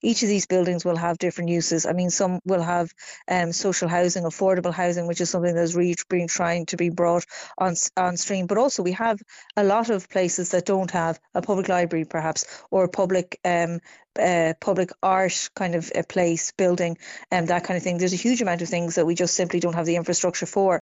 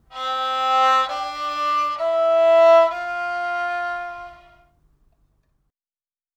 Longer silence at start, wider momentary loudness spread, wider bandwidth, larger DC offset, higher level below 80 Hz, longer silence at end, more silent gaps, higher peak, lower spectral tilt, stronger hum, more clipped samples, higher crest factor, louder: about the same, 0.05 s vs 0.1 s; second, 5 LU vs 13 LU; about the same, 8.2 kHz vs 8.8 kHz; neither; about the same, -62 dBFS vs -60 dBFS; second, 0 s vs 2 s; neither; about the same, -6 dBFS vs -4 dBFS; first, -4.5 dB/octave vs -2 dB/octave; neither; neither; about the same, 16 dB vs 16 dB; second, -23 LUFS vs -19 LUFS